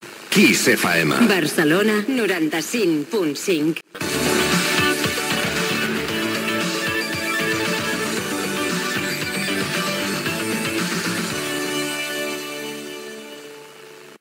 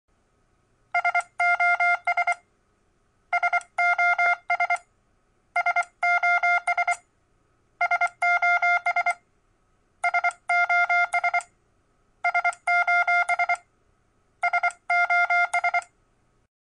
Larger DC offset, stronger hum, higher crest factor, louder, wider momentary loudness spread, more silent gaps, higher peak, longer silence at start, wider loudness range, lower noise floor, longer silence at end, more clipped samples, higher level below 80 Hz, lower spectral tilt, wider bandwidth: neither; neither; about the same, 18 dB vs 14 dB; first, -20 LUFS vs -23 LUFS; first, 11 LU vs 8 LU; neither; first, -2 dBFS vs -12 dBFS; second, 0 s vs 0.95 s; first, 5 LU vs 2 LU; second, -42 dBFS vs -66 dBFS; second, 0.05 s vs 0.85 s; neither; first, -54 dBFS vs -70 dBFS; first, -3.5 dB/octave vs 0.5 dB/octave; first, 16.5 kHz vs 11.5 kHz